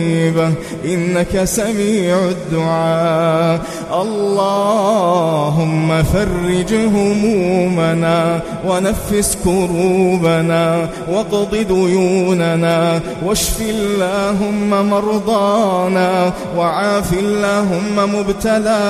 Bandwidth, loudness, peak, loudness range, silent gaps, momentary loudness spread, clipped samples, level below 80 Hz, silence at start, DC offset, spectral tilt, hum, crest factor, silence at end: 15.5 kHz; -15 LUFS; -2 dBFS; 1 LU; none; 4 LU; under 0.1%; -34 dBFS; 0 s; under 0.1%; -5.5 dB/octave; none; 14 dB; 0 s